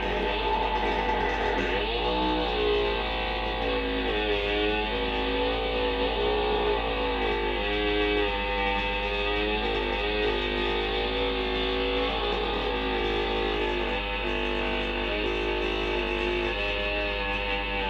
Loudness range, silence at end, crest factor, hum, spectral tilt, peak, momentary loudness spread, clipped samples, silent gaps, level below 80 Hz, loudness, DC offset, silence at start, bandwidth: 1 LU; 0 s; 14 dB; none; -5.5 dB/octave; -14 dBFS; 2 LU; under 0.1%; none; -36 dBFS; -27 LUFS; under 0.1%; 0 s; 7.8 kHz